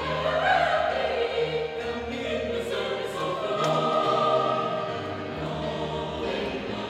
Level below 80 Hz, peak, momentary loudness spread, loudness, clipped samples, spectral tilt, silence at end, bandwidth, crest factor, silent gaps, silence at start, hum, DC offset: -50 dBFS; -10 dBFS; 8 LU; -27 LUFS; under 0.1%; -5 dB/octave; 0 s; 14 kHz; 16 dB; none; 0 s; none; under 0.1%